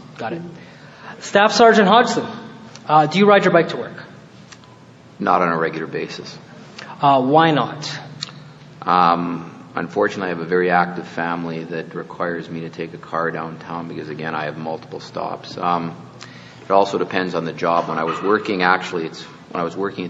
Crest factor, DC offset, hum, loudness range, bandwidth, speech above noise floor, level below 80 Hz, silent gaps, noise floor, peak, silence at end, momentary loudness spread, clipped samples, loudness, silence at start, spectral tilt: 20 dB; under 0.1%; none; 11 LU; 8 kHz; 25 dB; -64 dBFS; none; -44 dBFS; 0 dBFS; 0 s; 20 LU; under 0.1%; -19 LUFS; 0 s; -5.5 dB/octave